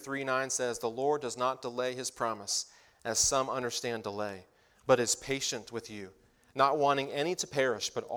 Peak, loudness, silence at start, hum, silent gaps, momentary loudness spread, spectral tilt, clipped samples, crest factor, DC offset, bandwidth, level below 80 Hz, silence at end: -10 dBFS; -31 LUFS; 0 s; none; none; 15 LU; -2.5 dB/octave; under 0.1%; 22 dB; under 0.1%; 19 kHz; -64 dBFS; 0 s